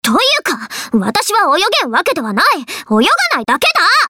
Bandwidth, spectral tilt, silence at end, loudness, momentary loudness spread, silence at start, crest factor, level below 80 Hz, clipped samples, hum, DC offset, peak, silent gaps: 17.5 kHz; -2.5 dB/octave; 0 s; -12 LUFS; 6 LU; 0.05 s; 10 dB; -54 dBFS; under 0.1%; none; under 0.1%; -2 dBFS; none